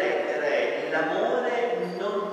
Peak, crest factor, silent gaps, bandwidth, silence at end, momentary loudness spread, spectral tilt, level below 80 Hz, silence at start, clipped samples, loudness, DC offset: -12 dBFS; 14 dB; none; 11 kHz; 0 s; 4 LU; -5 dB/octave; -90 dBFS; 0 s; under 0.1%; -26 LUFS; under 0.1%